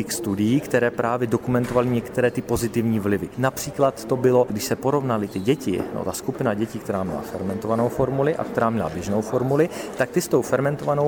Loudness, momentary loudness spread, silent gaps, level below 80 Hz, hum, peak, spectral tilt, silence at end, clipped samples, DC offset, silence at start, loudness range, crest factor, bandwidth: -23 LUFS; 6 LU; none; -50 dBFS; none; -4 dBFS; -6 dB/octave; 0 s; under 0.1%; under 0.1%; 0 s; 3 LU; 18 dB; 19.5 kHz